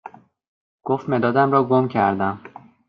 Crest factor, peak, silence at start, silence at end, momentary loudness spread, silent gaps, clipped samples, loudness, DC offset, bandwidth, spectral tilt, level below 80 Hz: 16 dB; -4 dBFS; 0.05 s; 0.4 s; 11 LU; 0.48-0.79 s; under 0.1%; -20 LUFS; under 0.1%; 5.6 kHz; -9.5 dB/octave; -66 dBFS